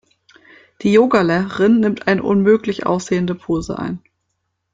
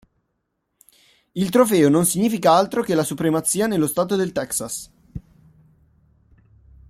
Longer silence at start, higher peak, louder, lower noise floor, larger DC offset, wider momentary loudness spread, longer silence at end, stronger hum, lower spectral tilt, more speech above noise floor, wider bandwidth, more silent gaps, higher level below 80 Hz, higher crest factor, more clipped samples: second, 0.8 s vs 1.35 s; about the same, -2 dBFS vs -2 dBFS; about the same, -17 LUFS vs -19 LUFS; about the same, -72 dBFS vs -74 dBFS; neither; second, 10 LU vs 18 LU; second, 0.75 s vs 1.7 s; neither; first, -6.5 dB/octave vs -5 dB/octave; about the same, 57 dB vs 55 dB; second, 7.8 kHz vs 16.5 kHz; neither; first, -48 dBFS vs -54 dBFS; about the same, 16 dB vs 20 dB; neither